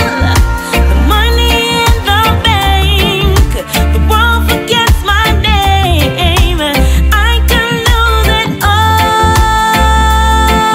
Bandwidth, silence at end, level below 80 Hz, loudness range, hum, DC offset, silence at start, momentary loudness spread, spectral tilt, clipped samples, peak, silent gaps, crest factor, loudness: 16.5 kHz; 0 s; -12 dBFS; 1 LU; none; under 0.1%; 0 s; 2 LU; -4.5 dB/octave; under 0.1%; 0 dBFS; none; 8 dB; -9 LUFS